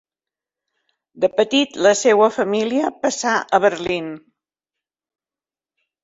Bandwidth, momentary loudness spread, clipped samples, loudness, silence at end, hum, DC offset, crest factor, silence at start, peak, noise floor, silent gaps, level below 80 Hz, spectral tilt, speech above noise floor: 8 kHz; 9 LU; under 0.1%; -18 LUFS; 1.85 s; none; under 0.1%; 18 dB; 1.15 s; -2 dBFS; under -90 dBFS; none; -62 dBFS; -3 dB/octave; over 72 dB